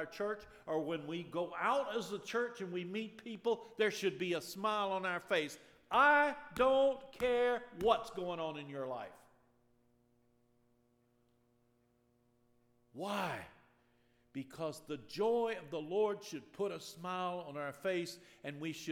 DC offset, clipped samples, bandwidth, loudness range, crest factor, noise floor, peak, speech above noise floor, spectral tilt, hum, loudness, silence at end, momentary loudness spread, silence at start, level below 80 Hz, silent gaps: under 0.1%; under 0.1%; 18 kHz; 14 LU; 24 dB; -75 dBFS; -14 dBFS; 38 dB; -4.5 dB/octave; none; -37 LUFS; 0 s; 14 LU; 0 s; -70 dBFS; none